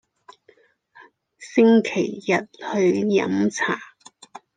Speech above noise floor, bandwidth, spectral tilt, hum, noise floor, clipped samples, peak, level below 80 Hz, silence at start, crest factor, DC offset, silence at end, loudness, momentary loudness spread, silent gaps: 38 dB; 9.4 kHz; -5.5 dB/octave; none; -58 dBFS; under 0.1%; -4 dBFS; -72 dBFS; 1.4 s; 18 dB; under 0.1%; 0.7 s; -21 LUFS; 9 LU; none